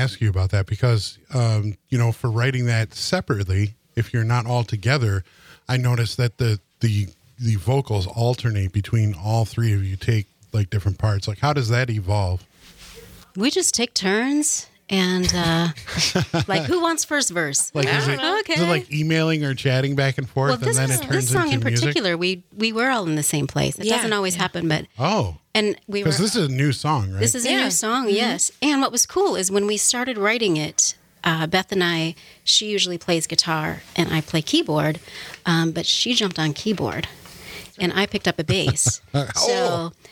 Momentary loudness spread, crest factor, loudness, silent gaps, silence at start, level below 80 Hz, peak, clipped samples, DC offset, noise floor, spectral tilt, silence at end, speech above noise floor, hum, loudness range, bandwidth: 6 LU; 20 dB; -21 LUFS; none; 0 s; -50 dBFS; -2 dBFS; under 0.1%; under 0.1%; -45 dBFS; -4 dB/octave; 0.2 s; 24 dB; none; 3 LU; 16.5 kHz